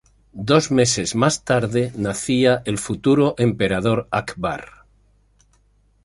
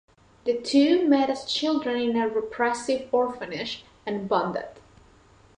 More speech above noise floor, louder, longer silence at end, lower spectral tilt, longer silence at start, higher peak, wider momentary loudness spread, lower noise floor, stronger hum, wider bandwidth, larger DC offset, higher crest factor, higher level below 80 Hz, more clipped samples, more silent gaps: first, 40 dB vs 31 dB; first, -19 LUFS vs -25 LUFS; first, 1.4 s vs 0.8 s; about the same, -5 dB/octave vs -4.5 dB/octave; about the same, 0.35 s vs 0.45 s; first, -2 dBFS vs -10 dBFS; second, 9 LU vs 13 LU; first, -59 dBFS vs -55 dBFS; first, 50 Hz at -50 dBFS vs none; first, 11.5 kHz vs 10 kHz; neither; about the same, 18 dB vs 16 dB; first, -48 dBFS vs -62 dBFS; neither; neither